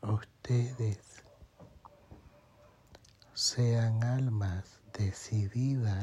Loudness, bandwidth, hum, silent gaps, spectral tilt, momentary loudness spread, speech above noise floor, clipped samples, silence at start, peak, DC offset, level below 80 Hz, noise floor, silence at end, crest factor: -33 LUFS; 11.5 kHz; none; none; -5.5 dB/octave; 10 LU; 30 dB; under 0.1%; 0.05 s; -18 dBFS; under 0.1%; -64 dBFS; -61 dBFS; 0 s; 16 dB